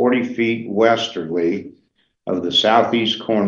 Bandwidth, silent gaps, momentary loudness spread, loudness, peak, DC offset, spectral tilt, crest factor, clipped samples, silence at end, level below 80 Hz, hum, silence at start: 7.6 kHz; none; 10 LU; -18 LUFS; 0 dBFS; under 0.1%; -5 dB/octave; 18 dB; under 0.1%; 0 s; -64 dBFS; none; 0 s